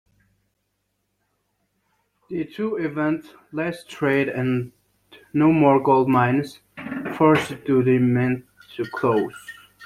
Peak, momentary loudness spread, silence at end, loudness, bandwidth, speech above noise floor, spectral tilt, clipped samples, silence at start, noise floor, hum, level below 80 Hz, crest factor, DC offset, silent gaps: -2 dBFS; 16 LU; 0 s; -21 LUFS; 14.5 kHz; 53 dB; -7.5 dB/octave; under 0.1%; 2.3 s; -74 dBFS; none; -60 dBFS; 20 dB; under 0.1%; none